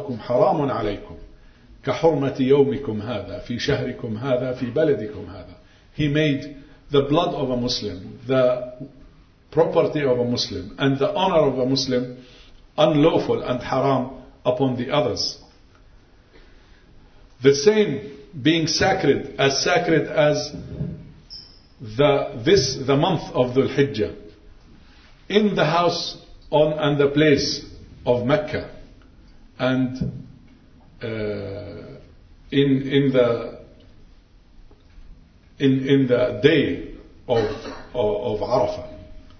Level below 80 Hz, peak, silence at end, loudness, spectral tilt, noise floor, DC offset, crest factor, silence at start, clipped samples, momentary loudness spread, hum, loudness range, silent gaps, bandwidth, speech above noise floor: -46 dBFS; 0 dBFS; 0.1 s; -21 LUFS; -5.5 dB/octave; -51 dBFS; under 0.1%; 22 dB; 0 s; under 0.1%; 17 LU; none; 5 LU; none; 6.6 kHz; 30 dB